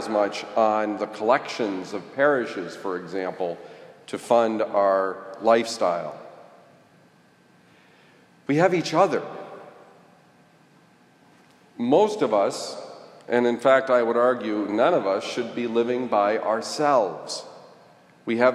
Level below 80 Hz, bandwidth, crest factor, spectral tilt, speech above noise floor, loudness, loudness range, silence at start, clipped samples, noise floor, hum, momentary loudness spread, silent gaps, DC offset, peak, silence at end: -82 dBFS; 12.5 kHz; 20 dB; -5 dB/octave; 34 dB; -23 LUFS; 6 LU; 0 s; under 0.1%; -57 dBFS; none; 16 LU; none; under 0.1%; -4 dBFS; 0 s